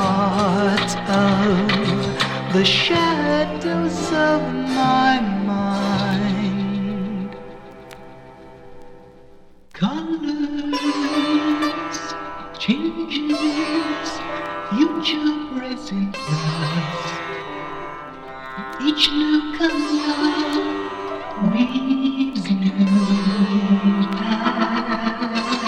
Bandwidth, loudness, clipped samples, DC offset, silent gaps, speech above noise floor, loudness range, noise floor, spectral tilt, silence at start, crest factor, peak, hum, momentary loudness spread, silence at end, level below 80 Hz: 11 kHz; -20 LUFS; under 0.1%; under 0.1%; none; 26 dB; 8 LU; -44 dBFS; -5.5 dB/octave; 0 s; 16 dB; -4 dBFS; none; 12 LU; 0 s; -48 dBFS